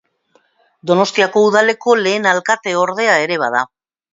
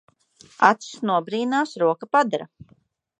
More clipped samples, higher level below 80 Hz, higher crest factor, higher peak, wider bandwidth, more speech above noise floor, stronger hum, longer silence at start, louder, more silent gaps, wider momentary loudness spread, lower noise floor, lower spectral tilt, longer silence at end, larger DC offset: neither; about the same, -68 dBFS vs -70 dBFS; second, 16 dB vs 22 dB; about the same, 0 dBFS vs -2 dBFS; second, 7.8 kHz vs 9.8 kHz; first, 44 dB vs 32 dB; neither; first, 0.85 s vs 0.6 s; first, -14 LUFS vs -22 LUFS; neither; about the same, 6 LU vs 8 LU; first, -58 dBFS vs -54 dBFS; about the same, -3.5 dB/octave vs -4.5 dB/octave; second, 0.5 s vs 0.75 s; neither